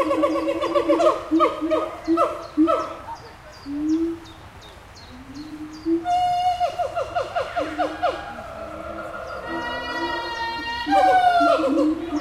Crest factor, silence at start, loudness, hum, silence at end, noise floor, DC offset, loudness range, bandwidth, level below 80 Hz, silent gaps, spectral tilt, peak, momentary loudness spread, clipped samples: 18 dB; 0 s; -22 LUFS; none; 0 s; -43 dBFS; under 0.1%; 6 LU; 13.5 kHz; -50 dBFS; none; -5 dB/octave; -6 dBFS; 20 LU; under 0.1%